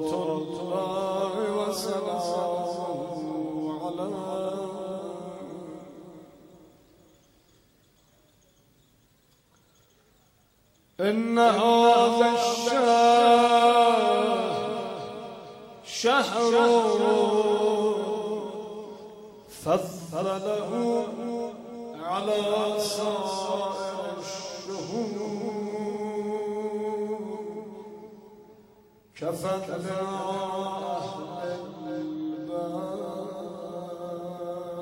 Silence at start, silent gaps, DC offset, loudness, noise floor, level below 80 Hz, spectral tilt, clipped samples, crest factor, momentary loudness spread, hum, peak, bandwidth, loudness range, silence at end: 0 s; none; under 0.1%; -26 LUFS; -63 dBFS; -68 dBFS; -4.5 dB/octave; under 0.1%; 20 dB; 18 LU; none; -8 dBFS; 16 kHz; 14 LU; 0 s